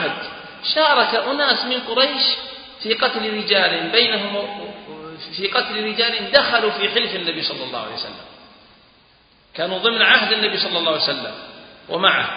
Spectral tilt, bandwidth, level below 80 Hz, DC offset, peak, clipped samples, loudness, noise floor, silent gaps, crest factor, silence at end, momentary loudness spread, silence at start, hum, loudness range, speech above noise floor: -6 dB/octave; 5.2 kHz; -60 dBFS; under 0.1%; 0 dBFS; under 0.1%; -18 LUFS; -54 dBFS; none; 20 dB; 0 s; 17 LU; 0 s; none; 3 LU; 35 dB